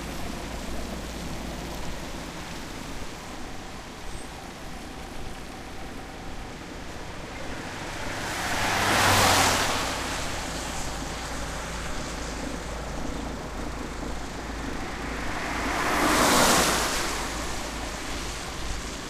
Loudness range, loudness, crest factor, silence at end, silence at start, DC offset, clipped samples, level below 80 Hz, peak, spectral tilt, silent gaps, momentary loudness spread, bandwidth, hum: 15 LU; -28 LUFS; 22 dB; 0 s; 0 s; under 0.1%; under 0.1%; -40 dBFS; -6 dBFS; -2.5 dB/octave; none; 19 LU; 15.5 kHz; none